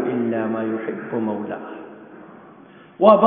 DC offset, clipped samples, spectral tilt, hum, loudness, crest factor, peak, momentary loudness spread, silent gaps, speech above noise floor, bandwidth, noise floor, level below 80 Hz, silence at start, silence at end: under 0.1%; under 0.1%; -11 dB/octave; none; -22 LUFS; 20 dB; 0 dBFS; 24 LU; none; 27 dB; 4.4 kHz; -46 dBFS; -68 dBFS; 0 s; 0 s